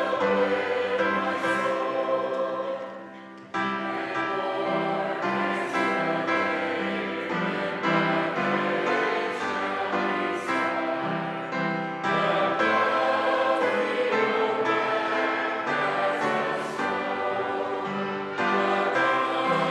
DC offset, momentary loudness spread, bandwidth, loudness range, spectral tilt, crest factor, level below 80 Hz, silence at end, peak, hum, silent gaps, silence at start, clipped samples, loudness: under 0.1%; 6 LU; 12 kHz; 4 LU; -5.5 dB/octave; 14 dB; -76 dBFS; 0 s; -10 dBFS; none; none; 0 s; under 0.1%; -26 LUFS